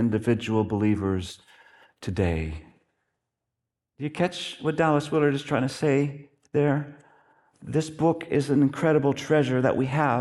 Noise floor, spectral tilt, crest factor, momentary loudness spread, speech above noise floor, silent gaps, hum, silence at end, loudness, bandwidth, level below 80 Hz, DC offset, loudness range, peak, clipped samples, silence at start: -85 dBFS; -7 dB/octave; 18 dB; 13 LU; 61 dB; none; none; 0 s; -25 LUFS; 12 kHz; -52 dBFS; under 0.1%; 7 LU; -8 dBFS; under 0.1%; 0 s